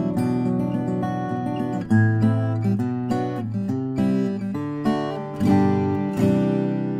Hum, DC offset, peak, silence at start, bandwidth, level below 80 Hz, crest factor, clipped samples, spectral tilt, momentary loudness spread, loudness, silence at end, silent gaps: none; under 0.1%; -6 dBFS; 0 s; 12 kHz; -56 dBFS; 16 dB; under 0.1%; -9 dB/octave; 7 LU; -23 LUFS; 0 s; none